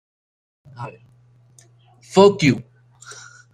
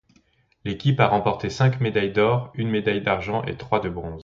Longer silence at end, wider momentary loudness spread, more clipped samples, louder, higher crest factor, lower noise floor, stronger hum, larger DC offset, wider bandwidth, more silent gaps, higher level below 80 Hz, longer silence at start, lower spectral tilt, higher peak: first, 0.95 s vs 0 s; first, 26 LU vs 8 LU; neither; first, -16 LUFS vs -23 LUFS; about the same, 20 dB vs 20 dB; second, -53 dBFS vs -62 dBFS; neither; neither; first, 11.5 kHz vs 7.4 kHz; neither; second, -60 dBFS vs -48 dBFS; first, 0.8 s vs 0.65 s; about the same, -6 dB/octave vs -7 dB/octave; about the same, -2 dBFS vs -2 dBFS